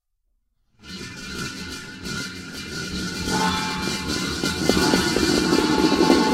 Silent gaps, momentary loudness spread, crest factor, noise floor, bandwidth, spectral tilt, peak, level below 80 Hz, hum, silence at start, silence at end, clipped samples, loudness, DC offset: none; 15 LU; 22 dB; -70 dBFS; 16 kHz; -4 dB/octave; 0 dBFS; -42 dBFS; none; 0.85 s; 0 s; under 0.1%; -22 LUFS; under 0.1%